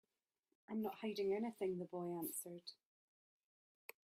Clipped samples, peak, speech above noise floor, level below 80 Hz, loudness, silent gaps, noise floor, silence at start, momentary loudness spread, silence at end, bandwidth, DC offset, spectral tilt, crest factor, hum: under 0.1%; -30 dBFS; 46 dB; -88 dBFS; -45 LUFS; none; -90 dBFS; 0.7 s; 15 LU; 1.3 s; 16 kHz; under 0.1%; -5 dB/octave; 16 dB; none